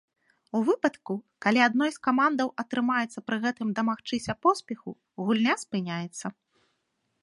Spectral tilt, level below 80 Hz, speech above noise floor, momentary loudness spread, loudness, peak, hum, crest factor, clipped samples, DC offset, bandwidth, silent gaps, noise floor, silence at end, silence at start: -5 dB/octave; -70 dBFS; 50 dB; 13 LU; -27 LUFS; -6 dBFS; none; 22 dB; under 0.1%; under 0.1%; 11.5 kHz; none; -77 dBFS; 0.9 s; 0.55 s